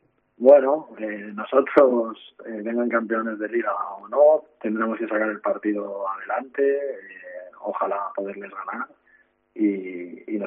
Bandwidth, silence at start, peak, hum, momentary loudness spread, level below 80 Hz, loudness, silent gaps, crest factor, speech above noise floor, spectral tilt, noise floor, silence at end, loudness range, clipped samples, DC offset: 3.8 kHz; 0.4 s; -2 dBFS; none; 17 LU; -78 dBFS; -23 LUFS; none; 22 dB; 38 dB; -5 dB/octave; -61 dBFS; 0 s; 8 LU; under 0.1%; under 0.1%